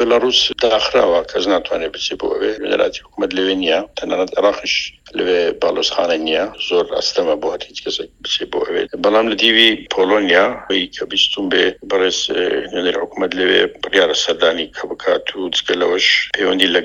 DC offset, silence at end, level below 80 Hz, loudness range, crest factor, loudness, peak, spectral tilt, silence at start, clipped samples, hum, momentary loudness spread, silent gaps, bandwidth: under 0.1%; 0 s; -50 dBFS; 4 LU; 16 dB; -16 LUFS; 0 dBFS; -2.5 dB/octave; 0 s; under 0.1%; none; 8 LU; none; 10.5 kHz